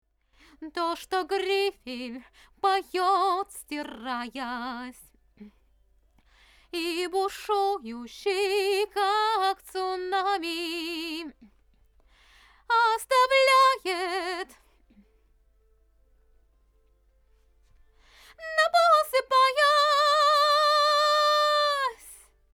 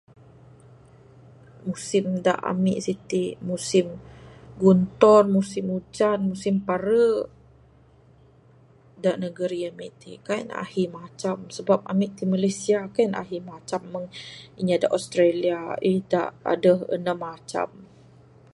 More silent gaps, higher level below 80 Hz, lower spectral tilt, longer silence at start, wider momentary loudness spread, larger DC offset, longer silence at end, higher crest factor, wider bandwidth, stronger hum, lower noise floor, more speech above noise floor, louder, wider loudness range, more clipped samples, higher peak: neither; about the same, -64 dBFS vs -60 dBFS; second, -1 dB/octave vs -6 dB/octave; second, 0.6 s vs 1.65 s; about the same, 16 LU vs 14 LU; neither; second, 0.4 s vs 0.7 s; about the same, 18 dB vs 22 dB; first, 19.5 kHz vs 11.5 kHz; neither; first, -64 dBFS vs -55 dBFS; first, 38 dB vs 31 dB; about the same, -25 LUFS vs -24 LUFS; first, 13 LU vs 8 LU; neither; second, -10 dBFS vs -2 dBFS